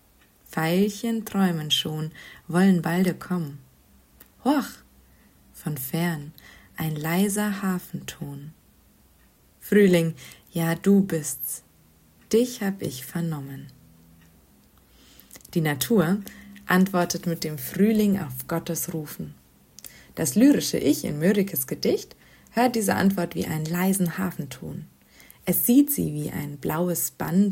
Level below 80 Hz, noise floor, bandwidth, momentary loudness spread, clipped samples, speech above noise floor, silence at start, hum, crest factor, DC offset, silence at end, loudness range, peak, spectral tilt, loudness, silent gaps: -58 dBFS; -58 dBFS; 16.5 kHz; 17 LU; under 0.1%; 34 dB; 0.5 s; none; 20 dB; under 0.1%; 0 s; 6 LU; -6 dBFS; -5 dB/octave; -24 LUFS; none